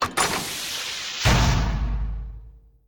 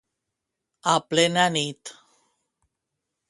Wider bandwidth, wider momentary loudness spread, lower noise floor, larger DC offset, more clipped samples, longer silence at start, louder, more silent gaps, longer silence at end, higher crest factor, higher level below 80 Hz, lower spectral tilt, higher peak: first, 19.5 kHz vs 11.5 kHz; second, 13 LU vs 18 LU; second, -46 dBFS vs -83 dBFS; neither; neither; second, 0 s vs 0.85 s; about the same, -24 LUFS vs -22 LUFS; neither; second, 0.3 s vs 1.4 s; second, 16 dB vs 22 dB; first, -28 dBFS vs -72 dBFS; about the same, -3.5 dB/octave vs -3 dB/octave; second, -8 dBFS vs -4 dBFS